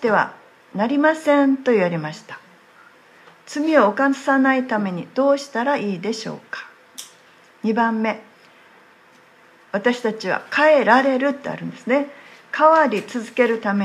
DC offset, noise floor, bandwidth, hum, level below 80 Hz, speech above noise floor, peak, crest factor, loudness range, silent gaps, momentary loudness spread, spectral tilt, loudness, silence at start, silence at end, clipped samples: under 0.1%; -51 dBFS; 13 kHz; none; -76 dBFS; 32 dB; -2 dBFS; 20 dB; 8 LU; none; 17 LU; -5.5 dB/octave; -19 LUFS; 0 s; 0 s; under 0.1%